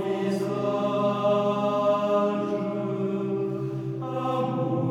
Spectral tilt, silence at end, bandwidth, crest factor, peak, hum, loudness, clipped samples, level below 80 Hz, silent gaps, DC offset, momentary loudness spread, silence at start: -8 dB/octave; 0 s; 13.5 kHz; 14 dB; -12 dBFS; none; -26 LUFS; under 0.1%; -66 dBFS; none; under 0.1%; 6 LU; 0 s